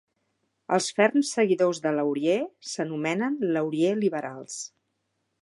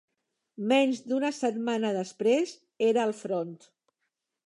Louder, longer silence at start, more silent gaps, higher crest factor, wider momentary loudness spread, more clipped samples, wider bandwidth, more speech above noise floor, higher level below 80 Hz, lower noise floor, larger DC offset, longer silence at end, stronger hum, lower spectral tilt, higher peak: about the same, -26 LUFS vs -28 LUFS; about the same, 0.7 s vs 0.6 s; neither; about the same, 20 dB vs 18 dB; first, 13 LU vs 9 LU; neither; about the same, 11.5 kHz vs 11 kHz; about the same, 52 dB vs 55 dB; about the same, -80 dBFS vs -84 dBFS; second, -77 dBFS vs -83 dBFS; neither; second, 0.75 s vs 0.9 s; neither; about the same, -4.5 dB/octave vs -5 dB/octave; first, -6 dBFS vs -12 dBFS